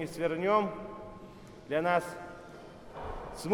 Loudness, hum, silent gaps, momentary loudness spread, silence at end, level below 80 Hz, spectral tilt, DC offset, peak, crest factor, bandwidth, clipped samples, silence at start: -32 LUFS; none; none; 21 LU; 0 s; -54 dBFS; -5.5 dB/octave; under 0.1%; -14 dBFS; 20 dB; 19 kHz; under 0.1%; 0 s